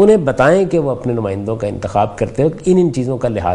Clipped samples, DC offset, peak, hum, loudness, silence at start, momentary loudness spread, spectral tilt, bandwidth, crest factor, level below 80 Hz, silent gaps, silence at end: under 0.1%; under 0.1%; 0 dBFS; none; -15 LUFS; 0 s; 8 LU; -7.5 dB/octave; 11 kHz; 14 dB; -38 dBFS; none; 0 s